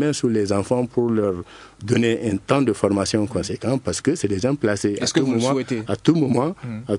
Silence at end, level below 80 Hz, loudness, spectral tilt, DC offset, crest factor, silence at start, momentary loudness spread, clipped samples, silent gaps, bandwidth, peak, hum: 0 s; -56 dBFS; -21 LUFS; -5.5 dB/octave; under 0.1%; 18 dB; 0 s; 6 LU; under 0.1%; none; 11 kHz; -2 dBFS; none